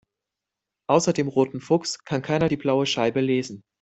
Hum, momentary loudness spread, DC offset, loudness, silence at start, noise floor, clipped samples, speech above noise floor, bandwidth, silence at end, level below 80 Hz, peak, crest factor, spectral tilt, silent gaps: none; 7 LU; under 0.1%; -23 LUFS; 0.9 s; -86 dBFS; under 0.1%; 63 dB; 8.4 kHz; 0.2 s; -60 dBFS; -4 dBFS; 20 dB; -5 dB/octave; none